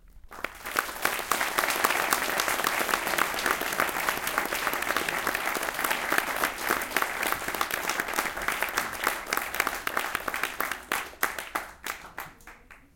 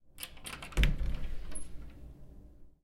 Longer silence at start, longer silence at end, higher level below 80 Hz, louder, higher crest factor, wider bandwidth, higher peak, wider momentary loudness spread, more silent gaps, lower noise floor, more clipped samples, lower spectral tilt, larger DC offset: about the same, 0.05 s vs 0.05 s; about the same, 0.15 s vs 0.15 s; second, -54 dBFS vs -36 dBFS; first, -28 LUFS vs -38 LUFS; about the same, 28 dB vs 24 dB; about the same, 17 kHz vs 16.5 kHz; first, -2 dBFS vs -10 dBFS; second, 9 LU vs 23 LU; neither; about the same, -50 dBFS vs -53 dBFS; neither; second, -1 dB/octave vs -4.5 dB/octave; neither